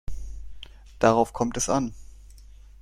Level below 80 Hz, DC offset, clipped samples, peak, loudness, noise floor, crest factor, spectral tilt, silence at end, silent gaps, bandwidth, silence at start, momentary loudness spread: -42 dBFS; under 0.1%; under 0.1%; -4 dBFS; -24 LUFS; -47 dBFS; 22 dB; -4.5 dB/octave; 0.4 s; none; 16 kHz; 0.1 s; 25 LU